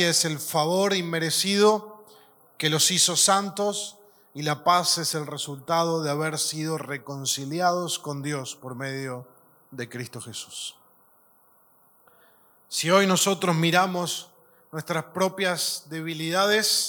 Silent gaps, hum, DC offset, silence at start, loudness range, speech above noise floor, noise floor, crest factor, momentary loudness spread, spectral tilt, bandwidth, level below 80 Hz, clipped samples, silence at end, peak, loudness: none; none; under 0.1%; 0 s; 14 LU; 35 dB; -60 dBFS; 22 dB; 16 LU; -3 dB/octave; 19 kHz; -80 dBFS; under 0.1%; 0 s; -4 dBFS; -24 LUFS